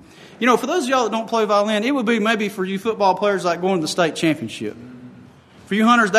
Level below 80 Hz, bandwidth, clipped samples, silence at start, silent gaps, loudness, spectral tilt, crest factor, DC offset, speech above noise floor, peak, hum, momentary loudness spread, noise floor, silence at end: -66 dBFS; 13.5 kHz; under 0.1%; 0.2 s; none; -19 LUFS; -4.5 dB/octave; 18 dB; under 0.1%; 27 dB; -2 dBFS; none; 8 LU; -45 dBFS; 0 s